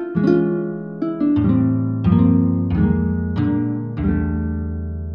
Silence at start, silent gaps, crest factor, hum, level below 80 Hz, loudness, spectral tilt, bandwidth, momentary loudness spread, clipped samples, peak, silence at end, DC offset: 0 s; none; 16 dB; none; -32 dBFS; -19 LUFS; -11.5 dB/octave; 5.2 kHz; 10 LU; under 0.1%; -2 dBFS; 0 s; under 0.1%